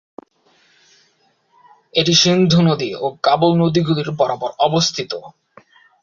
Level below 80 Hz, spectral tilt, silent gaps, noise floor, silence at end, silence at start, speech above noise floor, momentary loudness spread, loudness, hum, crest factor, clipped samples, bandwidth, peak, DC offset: -56 dBFS; -5 dB/octave; none; -60 dBFS; 0.75 s; 1.95 s; 44 dB; 10 LU; -16 LUFS; none; 18 dB; under 0.1%; 7.6 kHz; -2 dBFS; under 0.1%